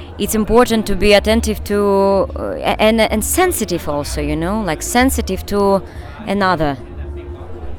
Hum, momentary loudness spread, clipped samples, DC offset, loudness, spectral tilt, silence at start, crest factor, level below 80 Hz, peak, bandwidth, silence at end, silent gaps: none; 16 LU; under 0.1%; under 0.1%; -16 LUFS; -4.5 dB/octave; 0 s; 14 dB; -28 dBFS; 0 dBFS; 19.5 kHz; 0 s; none